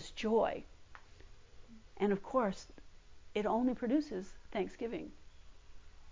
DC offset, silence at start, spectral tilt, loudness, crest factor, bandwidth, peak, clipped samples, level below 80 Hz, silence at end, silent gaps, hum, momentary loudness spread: under 0.1%; 0 s; -6.5 dB/octave; -36 LUFS; 18 dB; 7.6 kHz; -20 dBFS; under 0.1%; -60 dBFS; 0 s; none; none; 17 LU